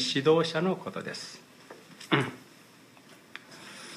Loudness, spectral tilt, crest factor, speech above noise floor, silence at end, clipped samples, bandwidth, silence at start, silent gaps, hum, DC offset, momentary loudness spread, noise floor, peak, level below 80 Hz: -29 LUFS; -5 dB/octave; 24 dB; 27 dB; 0 s; under 0.1%; 15 kHz; 0 s; none; none; under 0.1%; 25 LU; -55 dBFS; -8 dBFS; -78 dBFS